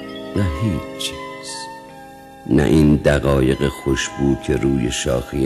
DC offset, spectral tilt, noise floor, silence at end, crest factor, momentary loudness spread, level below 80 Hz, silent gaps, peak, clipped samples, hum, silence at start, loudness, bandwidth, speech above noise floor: under 0.1%; -6 dB/octave; -39 dBFS; 0 s; 16 dB; 17 LU; -32 dBFS; none; -2 dBFS; under 0.1%; none; 0 s; -19 LUFS; 14 kHz; 22 dB